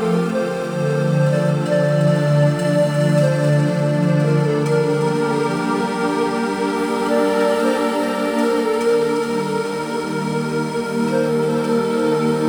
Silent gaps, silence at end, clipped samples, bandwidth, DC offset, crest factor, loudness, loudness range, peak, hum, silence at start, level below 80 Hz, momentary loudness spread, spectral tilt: none; 0 s; under 0.1%; over 20 kHz; under 0.1%; 12 dB; -18 LUFS; 3 LU; -6 dBFS; none; 0 s; -58 dBFS; 5 LU; -7 dB/octave